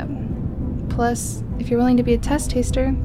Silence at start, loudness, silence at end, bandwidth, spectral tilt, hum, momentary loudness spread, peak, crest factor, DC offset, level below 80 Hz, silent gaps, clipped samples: 0 s; -21 LUFS; 0 s; 15.5 kHz; -6 dB/octave; none; 10 LU; -6 dBFS; 14 dB; 0.2%; -28 dBFS; none; under 0.1%